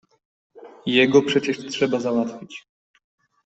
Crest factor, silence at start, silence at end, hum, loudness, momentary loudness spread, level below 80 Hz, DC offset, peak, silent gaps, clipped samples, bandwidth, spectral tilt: 20 dB; 0.55 s; 0.85 s; none; -21 LUFS; 22 LU; -66 dBFS; under 0.1%; -4 dBFS; none; under 0.1%; 8.2 kHz; -5 dB/octave